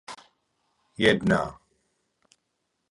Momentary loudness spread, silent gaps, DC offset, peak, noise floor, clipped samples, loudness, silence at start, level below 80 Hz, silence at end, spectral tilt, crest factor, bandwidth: 25 LU; none; under 0.1%; -6 dBFS; -78 dBFS; under 0.1%; -24 LUFS; 0.1 s; -54 dBFS; 1.4 s; -5.5 dB/octave; 24 dB; 11.5 kHz